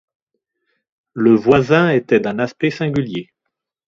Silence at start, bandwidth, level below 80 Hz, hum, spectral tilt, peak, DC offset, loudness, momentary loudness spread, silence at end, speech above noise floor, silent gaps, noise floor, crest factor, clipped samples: 1.15 s; 7.4 kHz; -52 dBFS; none; -7.5 dB/octave; 0 dBFS; under 0.1%; -16 LUFS; 12 LU; 0.65 s; 63 dB; none; -78 dBFS; 18 dB; under 0.1%